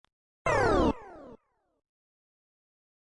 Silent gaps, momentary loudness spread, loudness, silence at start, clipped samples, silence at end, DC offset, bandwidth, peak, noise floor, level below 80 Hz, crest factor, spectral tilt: none; 16 LU; -27 LUFS; 0.45 s; under 0.1%; 1.8 s; under 0.1%; 11 kHz; -14 dBFS; -59 dBFS; -44 dBFS; 20 dB; -6 dB/octave